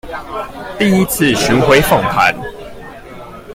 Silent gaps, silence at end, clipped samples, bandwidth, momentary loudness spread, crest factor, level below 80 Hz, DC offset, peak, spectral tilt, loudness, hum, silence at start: none; 0 s; under 0.1%; 16.5 kHz; 23 LU; 14 dB; -34 dBFS; under 0.1%; 0 dBFS; -4.5 dB/octave; -12 LUFS; none; 0.05 s